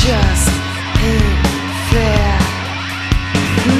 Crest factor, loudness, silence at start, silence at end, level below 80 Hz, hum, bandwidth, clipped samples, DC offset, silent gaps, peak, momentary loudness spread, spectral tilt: 14 dB; -15 LUFS; 0 s; 0 s; -18 dBFS; none; 14 kHz; under 0.1%; under 0.1%; none; 0 dBFS; 6 LU; -5 dB/octave